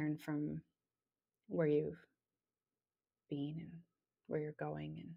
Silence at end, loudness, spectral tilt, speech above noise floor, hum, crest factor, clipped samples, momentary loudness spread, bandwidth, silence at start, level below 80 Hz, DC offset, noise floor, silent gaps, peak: 0 s; -42 LUFS; -9 dB/octave; over 49 dB; none; 20 dB; under 0.1%; 15 LU; 10 kHz; 0 s; -76 dBFS; under 0.1%; under -90 dBFS; none; -24 dBFS